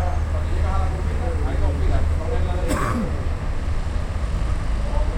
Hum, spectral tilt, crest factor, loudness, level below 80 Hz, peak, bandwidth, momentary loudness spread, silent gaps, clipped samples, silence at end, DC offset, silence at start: none; -7 dB/octave; 14 dB; -24 LUFS; -22 dBFS; -6 dBFS; 11.5 kHz; 4 LU; none; under 0.1%; 0 s; under 0.1%; 0 s